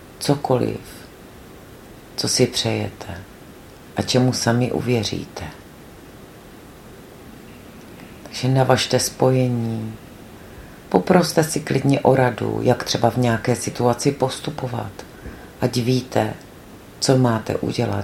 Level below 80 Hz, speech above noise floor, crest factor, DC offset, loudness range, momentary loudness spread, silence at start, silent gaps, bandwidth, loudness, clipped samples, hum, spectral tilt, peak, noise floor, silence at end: -50 dBFS; 22 dB; 22 dB; under 0.1%; 6 LU; 25 LU; 0 s; none; 16.5 kHz; -20 LUFS; under 0.1%; none; -5 dB/octave; 0 dBFS; -42 dBFS; 0 s